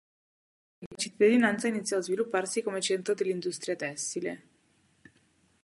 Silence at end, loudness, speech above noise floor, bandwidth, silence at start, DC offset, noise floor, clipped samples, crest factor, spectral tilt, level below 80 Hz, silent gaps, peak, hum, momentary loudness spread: 1.25 s; -29 LUFS; 39 dB; 11.5 kHz; 0.8 s; under 0.1%; -68 dBFS; under 0.1%; 20 dB; -3.5 dB/octave; -78 dBFS; 0.86-0.91 s; -12 dBFS; none; 12 LU